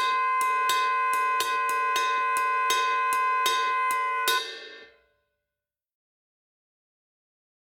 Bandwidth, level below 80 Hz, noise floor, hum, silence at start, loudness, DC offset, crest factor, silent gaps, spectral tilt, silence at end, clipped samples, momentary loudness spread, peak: 19 kHz; -80 dBFS; -89 dBFS; none; 0 s; -24 LUFS; under 0.1%; 18 dB; none; 1.5 dB/octave; 2.9 s; under 0.1%; 2 LU; -8 dBFS